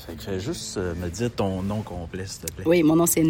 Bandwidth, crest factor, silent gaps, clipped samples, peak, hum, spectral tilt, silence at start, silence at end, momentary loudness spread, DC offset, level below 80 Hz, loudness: 17 kHz; 16 dB; none; under 0.1%; -8 dBFS; none; -5 dB/octave; 0 s; 0 s; 14 LU; under 0.1%; -46 dBFS; -25 LUFS